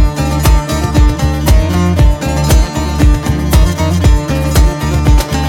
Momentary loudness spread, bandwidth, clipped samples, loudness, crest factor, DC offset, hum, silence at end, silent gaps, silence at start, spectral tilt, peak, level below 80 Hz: 3 LU; 17 kHz; under 0.1%; -12 LUFS; 10 dB; under 0.1%; none; 0 s; none; 0 s; -6 dB/octave; 0 dBFS; -12 dBFS